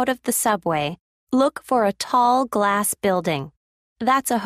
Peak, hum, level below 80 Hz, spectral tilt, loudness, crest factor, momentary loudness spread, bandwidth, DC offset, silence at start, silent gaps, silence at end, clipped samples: -6 dBFS; none; -60 dBFS; -4 dB/octave; -21 LUFS; 16 dB; 8 LU; 15.5 kHz; under 0.1%; 0 s; 1.00-1.27 s, 3.57-3.96 s; 0 s; under 0.1%